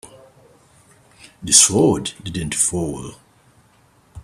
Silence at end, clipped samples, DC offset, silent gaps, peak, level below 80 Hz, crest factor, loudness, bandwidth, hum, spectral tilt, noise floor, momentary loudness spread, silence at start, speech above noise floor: 0.05 s; under 0.1%; under 0.1%; none; 0 dBFS; -48 dBFS; 22 dB; -16 LUFS; 15.5 kHz; none; -3 dB/octave; -55 dBFS; 22 LU; 0.05 s; 37 dB